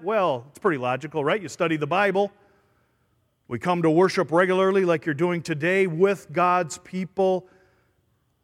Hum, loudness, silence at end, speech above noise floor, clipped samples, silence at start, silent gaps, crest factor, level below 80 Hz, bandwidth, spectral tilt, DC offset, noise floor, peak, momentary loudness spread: none; -23 LUFS; 1.05 s; 46 dB; under 0.1%; 0 s; none; 18 dB; -68 dBFS; 12.5 kHz; -6 dB/octave; under 0.1%; -68 dBFS; -6 dBFS; 8 LU